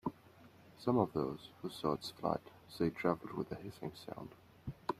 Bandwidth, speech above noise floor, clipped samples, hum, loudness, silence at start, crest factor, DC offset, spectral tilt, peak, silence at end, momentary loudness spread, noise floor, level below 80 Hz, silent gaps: 15.5 kHz; 23 dB; under 0.1%; none; -39 LUFS; 0.05 s; 24 dB; under 0.1%; -7 dB/octave; -16 dBFS; 0.05 s; 16 LU; -61 dBFS; -68 dBFS; none